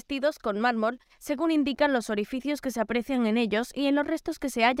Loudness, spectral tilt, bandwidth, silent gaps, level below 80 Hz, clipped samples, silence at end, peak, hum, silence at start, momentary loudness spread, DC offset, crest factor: -27 LUFS; -4.5 dB/octave; 16 kHz; none; -58 dBFS; under 0.1%; 0 s; -10 dBFS; none; 0.1 s; 6 LU; under 0.1%; 16 dB